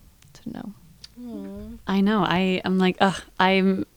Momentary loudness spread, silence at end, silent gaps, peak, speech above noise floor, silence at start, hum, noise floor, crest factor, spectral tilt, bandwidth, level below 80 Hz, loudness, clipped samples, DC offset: 18 LU; 0.1 s; none; -4 dBFS; 22 dB; 0.45 s; none; -44 dBFS; 20 dB; -6.5 dB/octave; 9.8 kHz; -52 dBFS; -22 LUFS; under 0.1%; under 0.1%